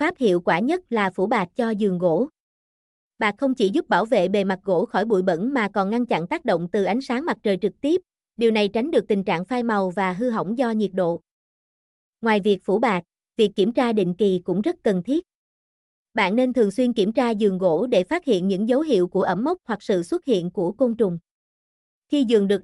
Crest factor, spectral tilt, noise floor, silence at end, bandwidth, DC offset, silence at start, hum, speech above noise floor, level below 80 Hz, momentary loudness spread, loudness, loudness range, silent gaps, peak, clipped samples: 16 dB; -6.5 dB/octave; under -90 dBFS; 0 s; 12 kHz; under 0.1%; 0 s; none; over 69 dB; -62 dBFS; 5 LU; -22 LUFS; 2 LU; 2.40-3.11 s, 11.31-12.13 s, 15.35-16.06 s, 21.31-22.02 s; -6 dBFS; under 0.1%